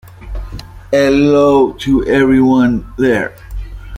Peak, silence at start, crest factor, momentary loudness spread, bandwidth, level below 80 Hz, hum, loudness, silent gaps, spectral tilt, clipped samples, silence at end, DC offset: -2 dBFS; 0.2 s; 12 dB; 20 LU; 12 kHz; -30 dBFS; none; -12 LUFS; none; -7 dB/octave; under 0.1%; 0 s; under 0.1%